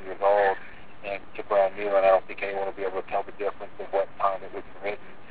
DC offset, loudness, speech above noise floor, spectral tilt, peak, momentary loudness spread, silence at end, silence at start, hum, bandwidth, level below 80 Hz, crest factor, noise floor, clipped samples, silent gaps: 1%; -27 LUFS; 19 dB; -8 dB/octave; -10 dBFS; 14 LU; 0 s; 0 s; none; 4 kHz; -60 dBFS; 18 dB; -45 dBFS; under 0.1%; none